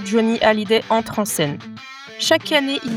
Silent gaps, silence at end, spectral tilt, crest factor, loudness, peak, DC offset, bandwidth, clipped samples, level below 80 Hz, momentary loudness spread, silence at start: none; 0 s; -3.5 dB/octave; 18 dB; -18 LUFS; 0 dBFS; under 0.1%; 18 kHz; under 0.1%; -56 dBFS; 18 LU; 0 s